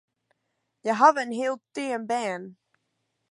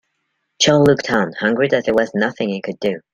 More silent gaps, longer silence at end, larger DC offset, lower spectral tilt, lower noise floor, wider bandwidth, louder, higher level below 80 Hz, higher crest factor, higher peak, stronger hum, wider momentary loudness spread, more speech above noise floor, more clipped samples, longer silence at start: neither; first, 0.8 s vs 0.15 s; neither; about the same, -4 dB/octave vs -4.5 dB/octave; first, -78 dBFS vs -71 dBFS; second, 11.5 kHz vs 14 kHz; second, -25 LUFS vs -17 LUFS; second, -84 dBFS vs -52 dBFS; first, 24 dB vs 16 dB; about the same, -4 dBFS vs -2 dBFS; neither; first, 13 LU vs 10 LU; about the same, 53 dB vs 55 dB; neither; first, 0.85 s vs 0.6 s